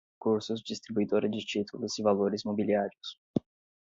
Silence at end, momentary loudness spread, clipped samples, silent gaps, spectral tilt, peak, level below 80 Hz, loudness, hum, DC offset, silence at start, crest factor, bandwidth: 0.5 s; 8 LU; under 0.1%; 3.18-3.34 s; -5.5 dB/octave; -12 dBFS; -68 dBFS; -31 LUFS; none; under 0.1%; 0.2 s; 20 dB; 7.8 kHz